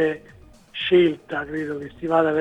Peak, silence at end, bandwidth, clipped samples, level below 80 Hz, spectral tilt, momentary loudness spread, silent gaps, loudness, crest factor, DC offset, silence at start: -6 dBFS; 0 s; 8 kHz; under 0.1%; -54 dBFS; -7 dB/octave; 14 LU; none; -22 LUFS; 16 dB; under 0.1%; 0 s